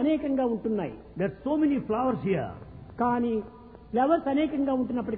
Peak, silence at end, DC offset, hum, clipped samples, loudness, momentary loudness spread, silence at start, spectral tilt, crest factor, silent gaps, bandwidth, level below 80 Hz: -12 dBFS; 0 s; under 0.1%; none; under 0.1%; -28 LUFS; 10 LU; 0 s; -11 dB/octave; 16 dB; none; 4.4 kHz; -54 dBFS